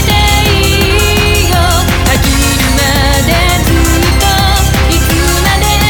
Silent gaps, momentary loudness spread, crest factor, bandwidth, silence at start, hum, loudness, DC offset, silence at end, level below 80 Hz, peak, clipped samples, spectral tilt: none; 1 LU; 8 dB; over 20 kHz; 0 s; none; -9 LUFS; under 0.1%; 0 s; -14 dBFS; 0 dBFS; under 0.1%; -4 dB/octave